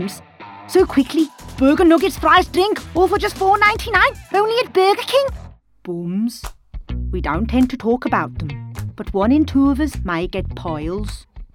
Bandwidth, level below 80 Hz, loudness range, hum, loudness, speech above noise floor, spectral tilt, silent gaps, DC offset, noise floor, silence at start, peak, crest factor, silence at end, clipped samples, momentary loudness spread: 17.5 kHz; -32 dBFS; 7 LU; none; -17 LUFS; 22 dB; -5.5 dB/octave; none; under 0.1%; -38 dBFS; 0 s; -2 dBFS; 16 dB; 0.1 s; under 0.1%; 16 LU